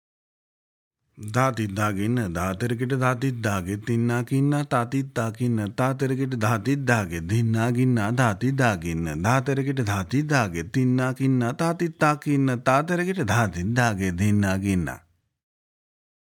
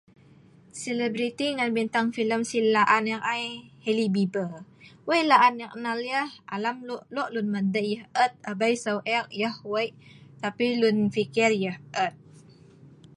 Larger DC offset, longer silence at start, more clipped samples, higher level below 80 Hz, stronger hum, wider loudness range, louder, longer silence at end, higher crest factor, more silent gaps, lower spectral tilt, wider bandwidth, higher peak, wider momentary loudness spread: neither; first, 1.15 s vs 0.75 s; neither; first, -56 dBFS vs -72 dBFS; neither; about the same, 2 LU vs 3 LU; about the same, -24 LUFS vs -26 LUFS; first, 1.35 s vs 0.25 s; about the same, 20 dB vs 22 dB; neither; first, -6.5 dB/octave vs -5 dB/octave; first, 17.5 kHz vs 11.5 kHz; about the same, -4 dBFS vs -4 dBFS; second, 5 LU vs 12 LU